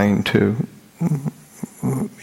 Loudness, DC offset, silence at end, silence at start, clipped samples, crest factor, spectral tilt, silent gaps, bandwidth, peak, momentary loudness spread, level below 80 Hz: -22 LUFS; under 0.1%; 0 s; 0 s; under 0.1%; 20 dB; -7 dB/octave; none; 16 kHz; -2 dBFS; 15 LU; -52 dBFS